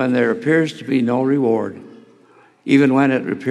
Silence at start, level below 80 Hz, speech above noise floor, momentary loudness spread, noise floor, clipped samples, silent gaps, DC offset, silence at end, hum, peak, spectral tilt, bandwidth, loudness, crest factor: 0 s; -78 dBFS; 34 dB; 7 LU; -51 dBFS; under 0.1%; none; under 0.1%; 0 s; none; -2 dBFS; -7 dB/octave; 10 kHz; -17 LUFS; 16 dB